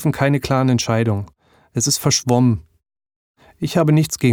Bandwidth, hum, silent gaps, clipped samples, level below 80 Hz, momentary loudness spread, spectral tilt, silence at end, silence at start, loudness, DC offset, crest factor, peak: over 20 kHz; none; 3.16-3.35 s; under 0.1%; -48 dBFS; 10 LU; -5 dB/octave; 0 s; 0 s; -18 LUFS; under 0.1%; 16 dB; -2 dBFS